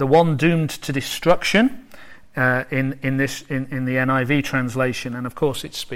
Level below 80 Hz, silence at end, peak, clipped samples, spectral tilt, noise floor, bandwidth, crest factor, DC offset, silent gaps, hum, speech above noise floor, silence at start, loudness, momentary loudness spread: -46 dBFS; 0 s; -4 dBFS; under 0.1%; -5.5 dB/octave; -45 dBFS; 16.5 kHz; 16 dB; under 0.1%; none; none; 25 dB; 0 s; -21 LUFS; 10 LU